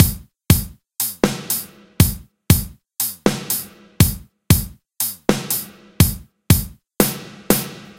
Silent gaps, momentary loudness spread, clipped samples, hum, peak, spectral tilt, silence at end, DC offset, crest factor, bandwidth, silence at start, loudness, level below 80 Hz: none; 17 LU; under 0.1%; none; 0 dBFS; -4.5 dB/octave; 0.1 s; under 0.1%; 20 dB; 17 kHz; 0 s; -19 LUFS; -32 dBFS